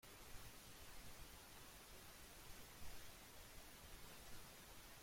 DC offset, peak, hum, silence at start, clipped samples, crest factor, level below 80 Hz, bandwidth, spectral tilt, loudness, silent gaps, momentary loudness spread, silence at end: under 0.1%; -40 dBFS; none; 0.05 s; under 0.1%; 16 dB; -66 dBFS; 16.5 kHz; -2.5 dB/octave; -59 LUFS; none; 1 LU; 0 s